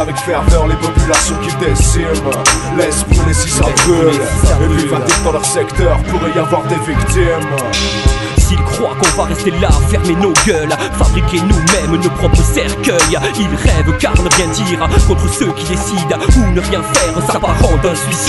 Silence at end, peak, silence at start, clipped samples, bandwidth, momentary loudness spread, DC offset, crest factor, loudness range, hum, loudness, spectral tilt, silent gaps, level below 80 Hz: 0 s; 0 dBFS; 0 s; under 0.1%; 12 kHz; 4 LU; under 0.1%; 12 dB; 2 LU; none; -12 LUFS; -4.5 dB/octave; none; -16 dBFS